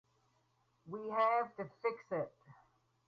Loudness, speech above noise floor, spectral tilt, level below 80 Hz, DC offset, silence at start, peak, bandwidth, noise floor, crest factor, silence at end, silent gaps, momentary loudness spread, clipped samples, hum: -38 LUFS; 40 dB; -4 dB/octave; -84 dBFS; under 0.1%; 0.85 s; -22 dBFS; 6.8 kHz; -77 dBFS; 18 dB; 0.55 s; none; 14 LU; under 0.1%; none